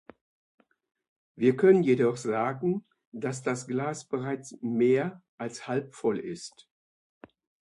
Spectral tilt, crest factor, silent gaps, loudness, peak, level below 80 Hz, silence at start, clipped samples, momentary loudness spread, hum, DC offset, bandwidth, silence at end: -6.5 dB/octave; 20 dB; 3.07-3.12 s, 5.29-5.38 s; -28 LUFS; -8 dBFS; -74 dBFS; 1.35 s; under 0.1%; 16 LU; none; under 0.1%; 11.5 kHz; 1.15 s